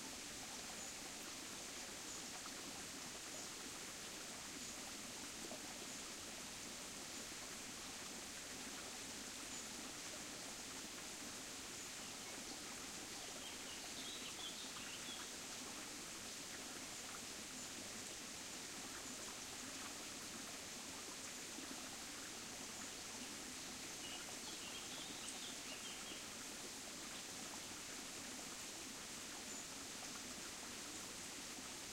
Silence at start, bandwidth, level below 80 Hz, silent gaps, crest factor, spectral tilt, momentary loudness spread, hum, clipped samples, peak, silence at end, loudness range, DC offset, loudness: 0 s; 16 kHz; -74 dBFS; none; 18 dB; -1 dB/octave; 1 LU; none; under 0.1%; -34 dBFS; 0 s; 1 LU; under 0.1%; -48 LUFS